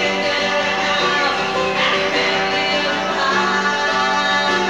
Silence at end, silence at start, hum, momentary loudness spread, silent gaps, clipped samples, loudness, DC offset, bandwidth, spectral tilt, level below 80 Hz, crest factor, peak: 0 s; 0 s; none; 2 LU; none; under 0.1%; -17 LUFS; 0.3%; 17 kHz; -3 dB/octave; -52 dBFS; 12 dB; -6 dBFS